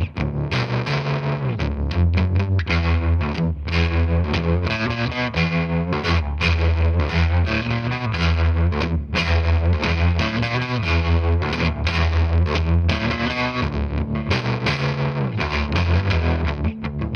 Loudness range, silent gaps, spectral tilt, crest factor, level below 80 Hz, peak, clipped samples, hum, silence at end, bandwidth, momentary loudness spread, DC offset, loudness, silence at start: 2 LU; none; -7 dB/octave; 16 dB; -26 dBFS; -4 dBFS; under 0.1%; none; 0 s; 6.6 kHz; 4 LU; under 0.1%; -21 LUFS; 0 s